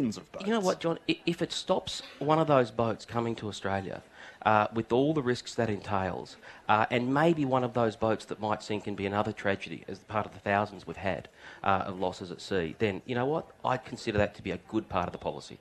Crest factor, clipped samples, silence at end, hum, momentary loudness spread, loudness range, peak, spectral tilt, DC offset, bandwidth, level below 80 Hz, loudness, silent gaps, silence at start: 22 dB; under 0.1%; 0.05 s; none; 11 LU; 4 LU; -8 dBFS; -6 dB/octave; under 0.1%; 12.5 kHz; -60 dBFS; -30 LUFS; none; 0 s